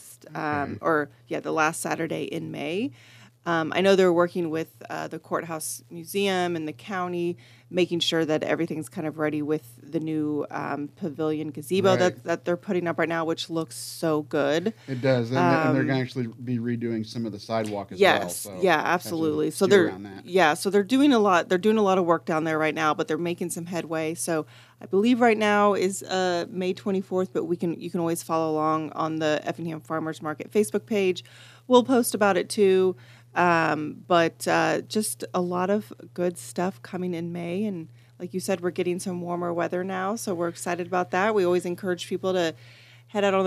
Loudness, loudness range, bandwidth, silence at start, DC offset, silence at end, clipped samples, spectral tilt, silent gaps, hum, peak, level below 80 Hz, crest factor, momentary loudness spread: -25 LUFS; 7 LU; 15 kHz; 0 s; under 0.1%; 0 s; under 0.1%; -5 dB/octave; none; none; -4 dBFS; -74 dBFS; 22 dB; 11 LU